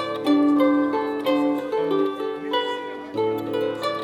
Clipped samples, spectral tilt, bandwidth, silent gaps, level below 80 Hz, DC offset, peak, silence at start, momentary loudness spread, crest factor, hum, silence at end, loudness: under 0.1%; -6 dB/octave; 13 kHz; none; -68 dBFS; under 0.1%; -8 dBFS; 0 s; 8 LU; 14 dB; none; 0 s; -23 LUFS